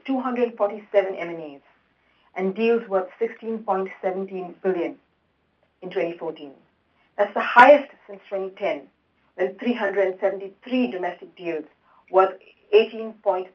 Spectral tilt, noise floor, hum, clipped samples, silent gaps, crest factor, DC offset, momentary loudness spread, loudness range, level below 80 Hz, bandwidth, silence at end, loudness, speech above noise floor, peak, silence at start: -6.5 dB/octave; -68 dBFS; none; under 0.1%; none; 24 dB; under 0.1%; 15 LU; 9 LU; -76 dBFS; 7 kHz; 0.05 s; -23 LUFS; 45 dB; 0 dBFS; 0.05 s